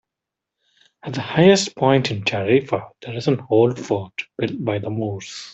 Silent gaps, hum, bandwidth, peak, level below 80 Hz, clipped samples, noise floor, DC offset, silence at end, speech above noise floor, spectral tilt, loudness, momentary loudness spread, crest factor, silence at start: none; none; 8.2 kHz; -2 dBFS; -60 dBFS; under 0.1%; -85 dBFS; under 0.1%; 0 s; 65 dB; -5.5 dB/octave; -20 LUFS; 15 LU; 18 dB; 1.05 s